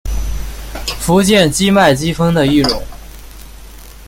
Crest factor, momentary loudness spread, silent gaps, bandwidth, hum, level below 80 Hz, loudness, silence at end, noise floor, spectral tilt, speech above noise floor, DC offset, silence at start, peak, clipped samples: 14 dB; 15 LU; none; 17 kHz; none; -26 dBFS; -13 LUFS; 0.05 s; -34 dBFS; -4.5 dB/octave; 23 dB; under 0.1%; 0.05 s; 0 dBFS; under 0.1%